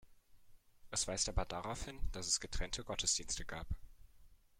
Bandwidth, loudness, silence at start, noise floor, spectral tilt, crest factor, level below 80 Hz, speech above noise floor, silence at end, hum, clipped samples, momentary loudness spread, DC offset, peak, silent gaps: 15.5 kHz; -39 LUFS; 0.05 s; -62 dBFS; -2 dB/octave; 20 dB; -48 dBFS; 23 dB; 0.25 s; none; under 0.1%; 11 LU; under 0.1%; -22 dBFS; none